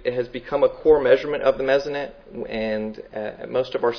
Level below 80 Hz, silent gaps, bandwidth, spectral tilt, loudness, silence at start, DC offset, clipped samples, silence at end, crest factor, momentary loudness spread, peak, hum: -48 dBFS; none; 5.4 kHz; -6 dB/octave; -22 LUFS; 0 s; under 0.1%; under 0.1%; 0 s; 18 dB; 14 LU; -4 dBFS; none